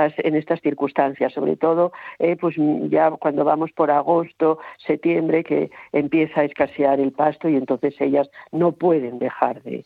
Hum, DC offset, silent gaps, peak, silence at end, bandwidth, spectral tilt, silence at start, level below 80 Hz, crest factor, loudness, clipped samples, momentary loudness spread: none; under 0.1%; none; -2 dBFS; 0.05 s; 4.7 kHz; -10 dB/octave; 0 s; -68 dBFS; 18 dB; -21 LUFS; under 0.1%; 5 LU